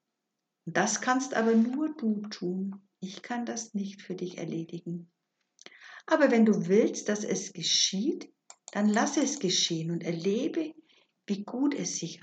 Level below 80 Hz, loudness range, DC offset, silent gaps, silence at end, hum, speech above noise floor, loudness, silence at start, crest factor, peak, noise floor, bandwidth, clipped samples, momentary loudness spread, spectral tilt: under -90 dBFS; 9 LU; under 0.1%; none; 0.05 s; none; 56 dB; -29 LUFS; 0.65 s; 20 dB; -10 dBFS; -85 dBFS; 9 kHz; under 0.1%; 15 LU; -3.5 dB/octave